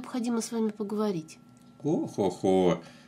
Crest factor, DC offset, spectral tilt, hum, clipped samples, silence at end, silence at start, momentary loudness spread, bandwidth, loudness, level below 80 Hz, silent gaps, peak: 18 dB; under 0.1%; -6 dB/octave; none; under 0.1%; 0.1 s; 0 s; 9 LU; 15.5 kHz; -29 LUFS; -68 dBFS; none; -10 dBFS